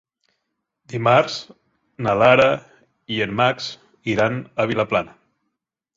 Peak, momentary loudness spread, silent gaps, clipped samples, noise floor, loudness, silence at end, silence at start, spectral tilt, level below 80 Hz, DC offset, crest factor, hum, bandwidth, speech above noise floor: -2 dBFS; 16 LU; none; under 0.1%; -79 dBFS; -19 LUFS; 0.9 s; 0.9 s; -5.5 dB/octave; -56 dBFS; under 0.1%; 20 dB; none; 7.8 kHz; 60 dB